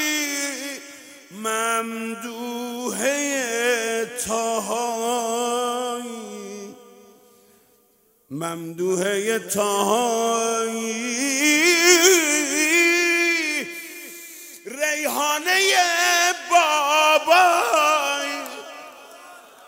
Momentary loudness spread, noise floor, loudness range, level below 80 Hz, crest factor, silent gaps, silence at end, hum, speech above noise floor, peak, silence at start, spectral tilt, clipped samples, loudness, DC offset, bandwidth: 20 LU; -61 dBFS; 11 LU; -70 dBFS; 20 dB; none; 0.3 s; none; 39 dB; -2 dBFS; 0 s; -1 dB/octave; under 0.1%; -20 LUFS; under 0.1%; 16.5 kHz